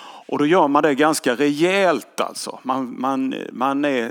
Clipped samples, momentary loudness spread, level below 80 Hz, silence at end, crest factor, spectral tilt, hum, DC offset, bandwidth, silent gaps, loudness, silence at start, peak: under 0.1%; 10 LU; -86 dBFS; 0 s; 18 dB; -4.5 dB/octave; none; under 0.1%; 18.5 kHz; none; -20 LUFS; 0 s; -2 dBFS